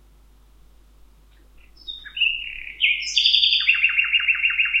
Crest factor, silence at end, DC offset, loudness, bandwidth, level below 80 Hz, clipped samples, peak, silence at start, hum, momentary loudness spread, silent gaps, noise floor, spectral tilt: 22 dB; 0 s; under 0.1%; -17 LUFS; 12 kHz; -52 dBFS; under 0.1%; -2 dBFS; 1.85 s; 50 Hz at -50 dBFS; 18 LU; none; -52 dBFS; 2.5 dB/octave